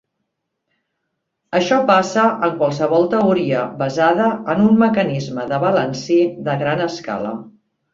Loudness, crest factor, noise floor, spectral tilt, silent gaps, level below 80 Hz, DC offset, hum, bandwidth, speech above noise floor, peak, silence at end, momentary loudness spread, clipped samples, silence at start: -17 LUFS; 16 dB; -75 dBFS; -6.5 dB/octave; none; -58 dBFS; under 0.1%; none; 7.6 kHz; 59 dB; -2 dBFS; 0.45 s; 9 LU; under 0.1%; 1.5 s